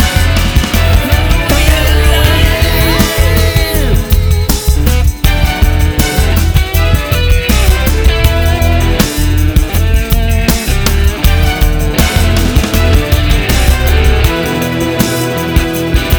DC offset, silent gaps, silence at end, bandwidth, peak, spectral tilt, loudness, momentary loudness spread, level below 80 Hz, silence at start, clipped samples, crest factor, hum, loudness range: under 0.1%; none; 0 s; over 20 kHz; 0 dBFS; -5 dB/octave; -11 LUFS; 3 LU; -12 dBFS; 0 s; 0.6%; 8 dB; none; 2 LU